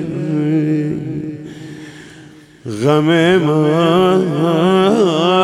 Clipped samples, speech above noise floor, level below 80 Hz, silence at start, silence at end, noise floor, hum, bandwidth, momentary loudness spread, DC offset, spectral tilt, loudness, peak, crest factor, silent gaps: under 0.1%; 28 dB; -56 dBFS; 0 s; 0 s; -40 dBFS; none; 12.5 kHz; 20 LU; under 0.1%; -7 dB/octave; -14 LUFS; -2 dBFS; 14 dB; none